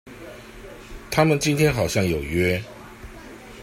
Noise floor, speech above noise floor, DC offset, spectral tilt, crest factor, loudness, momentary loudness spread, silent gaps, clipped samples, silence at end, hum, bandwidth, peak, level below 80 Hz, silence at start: -41 dBFS; 20 dB; under 0.1%; -5.5 dB/octave; 20 dB; -21 LUFS; 22 LU; none; under 0.1%; 0 s; none; 16 kHz; -4 dBFS; -44 dBFS; 0.05 s